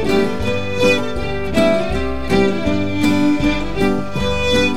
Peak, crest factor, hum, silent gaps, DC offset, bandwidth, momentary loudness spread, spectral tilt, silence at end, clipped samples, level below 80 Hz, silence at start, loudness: -2 dBFS; 14 dB; none; none; 6%; 16 kHz; 5 LU; -5.5 dB/octave; 0 s; under 0.1%; -30 dBFS; 0 s; -17 LUFS